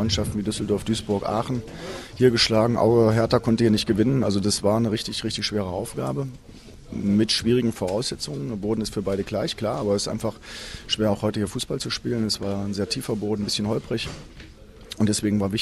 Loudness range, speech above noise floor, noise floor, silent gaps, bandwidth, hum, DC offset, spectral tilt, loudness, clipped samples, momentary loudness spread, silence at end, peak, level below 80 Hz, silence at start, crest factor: 6 LU; 21 dB; -44 dBFS; none; 14.5 kHz; none; under 0.1%; -5 dB/octave; -24 LUFS; under 0.1%; 11 LU; 0 s; -6 dBFS; -46 dBFS; 0 s; 18 dB